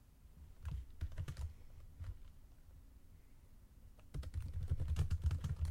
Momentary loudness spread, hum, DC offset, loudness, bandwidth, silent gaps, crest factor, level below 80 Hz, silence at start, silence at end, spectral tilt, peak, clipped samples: 25 LU; none; under 0.1%; -45 LUFS; 15.5 kHz; none; 18 dB; -48 dBFS; 0 s; 0 s; -7 dB/octave; -26 dBFS; under 0.1%